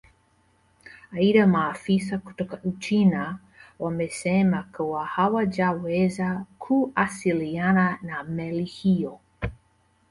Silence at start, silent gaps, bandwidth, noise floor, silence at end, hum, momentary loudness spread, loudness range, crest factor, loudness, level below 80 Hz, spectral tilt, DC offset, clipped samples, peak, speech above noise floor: 0.85 s; none; 11.5 kHz; -64 dBFS; 0.55 s; none; 12 LU; 2 LU; 18 dB; -25 LUFS; -52 dBFS; -7 dB/octave; under 0.1%; under 0.1%; -8 dBFS; 40 dB